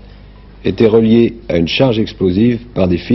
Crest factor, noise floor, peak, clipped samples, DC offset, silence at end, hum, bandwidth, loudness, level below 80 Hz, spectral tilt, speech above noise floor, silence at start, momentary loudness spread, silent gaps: 14 dB; -37 dBFS; 0 dBFS; under 0.1%; under 0.1%; 0 s; none; 6 kHz; -13 LUFS; -38 dBFS; -8.5 dB/octave; 25 dB; 0.05 s; 7 LU; none